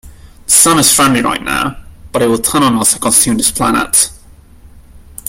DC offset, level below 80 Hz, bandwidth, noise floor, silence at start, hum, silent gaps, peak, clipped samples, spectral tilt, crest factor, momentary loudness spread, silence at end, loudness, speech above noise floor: under 0.1%; -38 dBFS; over 20 kHz; -39 dBFS; 0.05 s; none; none; 0 dBFS; 0.1%; -2.5 dB/octave; 14 dB; 10 LU; 0 s; -10 LUFS; 27 dB